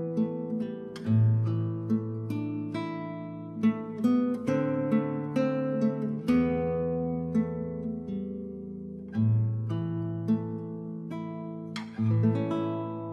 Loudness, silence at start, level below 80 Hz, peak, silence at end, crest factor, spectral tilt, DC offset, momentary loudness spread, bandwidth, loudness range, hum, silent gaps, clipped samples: -30 LUFS; 0 s; -60 dBFS; -14 dBFS; 0 s; 16 dB; -9.5 dB/octave; under 0.1%; 12 LU; 6.6 kHz; 4 LU; none; none; under 0.1%